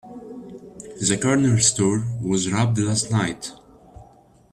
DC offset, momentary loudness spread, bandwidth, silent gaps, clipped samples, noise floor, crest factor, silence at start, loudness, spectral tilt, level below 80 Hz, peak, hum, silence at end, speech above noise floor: under 0.1%; 22 LU; 12.5 kHz; none; under 0.1%; -52 dBFS; 18 dB; 0.05 s; -20 LUFS; -4.5 dB/octave; -54 dBFS; -6 dBFS; none; 0.5 s; 31 dB